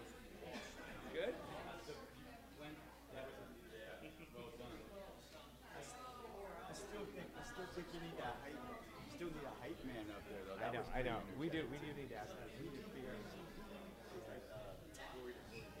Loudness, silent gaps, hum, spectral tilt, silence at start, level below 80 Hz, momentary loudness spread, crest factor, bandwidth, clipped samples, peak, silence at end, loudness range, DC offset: -51 LUFS; none; none; -5 dB/octave; 0 s; -62 dBFS; 11 LU; 22 dB; 16 kHz; under 0.1%; -30 dBFS; 0 s; 8 LU; under 0.1%